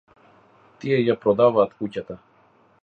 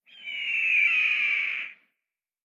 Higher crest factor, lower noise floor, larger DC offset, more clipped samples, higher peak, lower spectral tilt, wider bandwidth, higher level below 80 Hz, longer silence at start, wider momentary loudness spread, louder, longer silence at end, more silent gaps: about the same, 18 dB vs 14 dB; second, -58 dBFS vs -87 dBFS; neither; neither; first, -6 dBFS vs -14 dBFS; first, -8.5 dB/octave vs 1.5 dB/octave; second, 6.6 kHz vs 11 kHz; first, -62 dBFS vs under -90 dBFS; first, 0.85 s vs 0.15 s; first, 18 LU vs 14 LU; about the same, -21 LUFS vs -23 LUFS; about the same, 0.65 s vs 0.7 s; neither